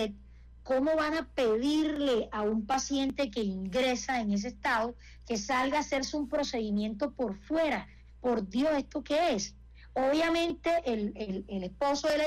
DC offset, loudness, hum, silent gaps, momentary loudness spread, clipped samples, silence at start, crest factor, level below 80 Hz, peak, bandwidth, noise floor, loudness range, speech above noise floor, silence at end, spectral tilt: under 0.1%; -31 LUFS; none; none; 8 LU; under 0.1%; 0 s; 8 dB; -54 dBFS; -22 dBFS; 15.5 kHz; -52 dBFS; 2 LU; 22 dB; 0 s; -4.5 dB/octave